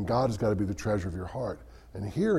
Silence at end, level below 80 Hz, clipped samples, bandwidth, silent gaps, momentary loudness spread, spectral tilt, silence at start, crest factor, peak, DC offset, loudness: 0 s; -48 dBFS; under 0.1%; 13.5 kHz; none; 12 LU; -7.5 dB/octave; 0 s; 16 dB; -14 dBFS; under 0.1%; -31 LUFS